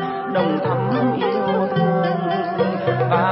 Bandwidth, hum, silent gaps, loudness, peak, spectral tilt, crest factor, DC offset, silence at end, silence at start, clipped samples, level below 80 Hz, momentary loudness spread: 5.8 kHz; none; none; -20 LUFS; -6 dBFS; -12 dB/octave; 12 dB; under 0.1%; 0 s; 0 s; under 0.1%; -62 dBFS; 3 LU